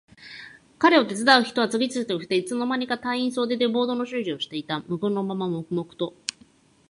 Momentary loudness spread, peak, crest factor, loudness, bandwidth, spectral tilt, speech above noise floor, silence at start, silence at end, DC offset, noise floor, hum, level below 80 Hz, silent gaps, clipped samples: 13 LU; -2 dBFS; 24 dB; -24 LUFS; 11.5 kHz; -4.5 dB/octave; 33 dB; 0.2 s; 0.8 s; under 0.1%; -57 dBFS; none; -70 dBFS; none; under 0.1%